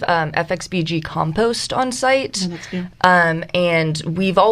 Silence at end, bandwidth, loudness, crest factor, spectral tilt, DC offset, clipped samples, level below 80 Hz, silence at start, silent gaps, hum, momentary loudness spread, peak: 0 s; 14 kHz; -18 LUFS; 18 dB; -4.5 dB/octave; under 0.1%; under 0.1%; -48 dBFS; 0 s; none; none; 8 LU; 0 dBFS